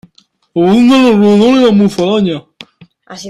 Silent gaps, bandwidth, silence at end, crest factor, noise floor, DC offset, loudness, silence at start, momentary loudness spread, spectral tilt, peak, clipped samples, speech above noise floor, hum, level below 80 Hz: none; 11.5 kHz; 0 s; 10 dB; -48 dBFS; under 0.1%; -9 LUFS; 0.55 s; 10 LU; -6.5 dB/octave; 0 dBFS; under 0.1%; 40 dB; none; -48 dBFS